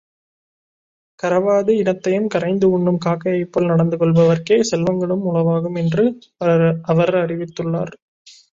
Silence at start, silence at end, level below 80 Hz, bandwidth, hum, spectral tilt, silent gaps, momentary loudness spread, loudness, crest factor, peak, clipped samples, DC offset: 1.25 s; 0.6 s; -56 dBFS; 7.6 kHz; none; -7 dB/octave; none; 7 LU; -18 LUFS; 14 dB; -2 dBFS; under 0.1%; under 0.1%